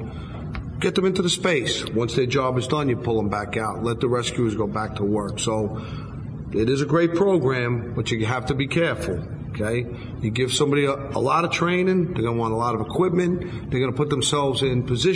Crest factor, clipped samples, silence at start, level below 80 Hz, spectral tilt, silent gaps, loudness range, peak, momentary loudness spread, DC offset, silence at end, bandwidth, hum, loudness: 16 dB; under 0.1%; 0 s; -44 dBFS; -5.5 dB/octave; none; 2 LU; -6 dBFS; 8 LU; under 0.1%; 0 s; 11 kHz; none; -23 LUFS